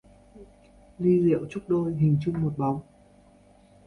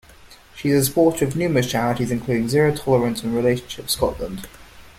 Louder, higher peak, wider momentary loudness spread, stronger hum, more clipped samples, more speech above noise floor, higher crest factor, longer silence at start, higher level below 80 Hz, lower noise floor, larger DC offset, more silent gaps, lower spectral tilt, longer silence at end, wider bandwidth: second, -25 LUFS vs -20 LUFS; second, -12 dBFS vs -4 dBFS; about the same, 7 LU vs 9 LU; neither; neither; first, 32 dB vs 27 dB; about the same, 16 dB vs 16 dB; about the same, 0.35 s vs 0.25 s; second, -56 dBFS vs -44 dBFS; first, -56 dBFS vs -46 dBFS; neither; neither; first, -10.5 dB/octave vs -5.5 dB/octave; first, 1.05 s vs 0.1 s; second, 6.8 kHz vs 16.5 kHz